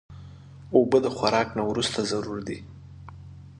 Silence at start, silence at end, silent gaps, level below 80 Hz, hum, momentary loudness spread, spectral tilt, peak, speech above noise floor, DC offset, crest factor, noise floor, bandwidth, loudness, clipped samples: 0.1 s; 0.05 s; none; -52 dBFS; none; 24 LU; -5 dB/octave; -6 dBFS; 20 dB; under 0.1%; 22 dB; -45 dBFS; 11 kHz; -25 LUFS; under 0.1%